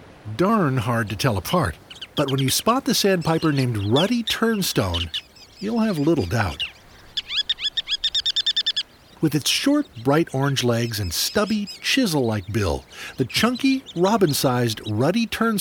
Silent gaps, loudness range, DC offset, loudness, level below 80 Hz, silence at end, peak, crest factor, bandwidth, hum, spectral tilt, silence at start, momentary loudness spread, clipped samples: none; 2 LU; under 0.1%; -21 LUFS; -46 dBFS; 0 s; -6 dBFS; 16 dB; 19.5 kHz; none; -4.5 dB/octave; 0 s; 8 LU; under 0.1%